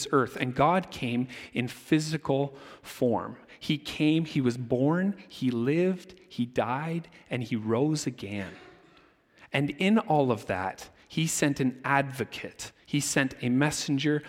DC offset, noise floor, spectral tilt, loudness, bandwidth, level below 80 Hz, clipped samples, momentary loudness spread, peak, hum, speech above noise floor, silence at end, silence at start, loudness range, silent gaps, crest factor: under 0.1%; -60 dBFS; -5 dB/octave; -28 LUFS; 16.5 kHz; -62 dBFS; under 0.1%; 11 LU; -8 dBFS; none; 32 dB; 0 s; 0 s; 3 LU; none; 20 dB